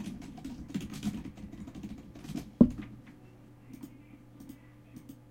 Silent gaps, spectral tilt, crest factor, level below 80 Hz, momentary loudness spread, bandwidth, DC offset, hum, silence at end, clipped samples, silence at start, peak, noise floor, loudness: none; -7.5 dB/octave; 30 dB; -54 dBFS; 28 LU; 16.5 kHz; under 0.1%; none; 0 s; under 0.1%; 0 s; -6 dBFS; -54 dBFS; -34 LUFS